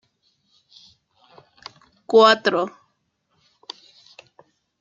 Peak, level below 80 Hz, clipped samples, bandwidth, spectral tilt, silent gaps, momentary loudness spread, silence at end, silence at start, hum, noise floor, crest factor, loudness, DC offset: -2 dBFS; -74 dBFS; under 0.1%; 7.6 kHz; -3.5 dB/octave; none; 29 LU; 2.15 s; 2.1 s; none; -71 dBFS; 22 dB; -17 LUFS; under 0.1%